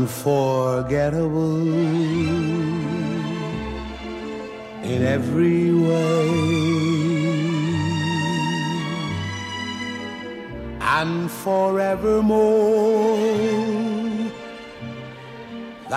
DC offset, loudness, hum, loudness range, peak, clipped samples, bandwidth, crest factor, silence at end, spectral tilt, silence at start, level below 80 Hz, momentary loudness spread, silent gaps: under 0.1%; -21 LUFS; none; 5 LU; -8 dBFS; under 0.1%; 15 kHz; 14 dB; 0 s; -6.5 dB/octave; 0 s; -46 dBFS; 15 LU; none